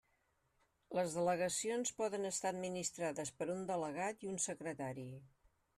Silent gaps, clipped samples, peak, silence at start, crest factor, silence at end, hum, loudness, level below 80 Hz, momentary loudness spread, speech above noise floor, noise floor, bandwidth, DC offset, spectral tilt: none; under 0.1%; -24 dBFS; 0.9 s; 16 dB; 0.5 s; none; -40 LUFS; -78 dBFS; 8 LU; 39 dB; -80 dBFS; 13.5 kHz; under 0.1%; -3.5 dB/octave